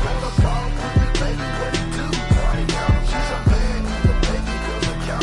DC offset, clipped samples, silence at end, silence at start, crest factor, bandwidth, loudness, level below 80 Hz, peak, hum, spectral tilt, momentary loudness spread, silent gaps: under 0.1%; under 0.1%; 0 s; 0 s; 16 dB; 11.5 kHz; -21 LUFS; -22 dBFS; -4 dBFS; none; -5.5 dB/octave; 4 LU; none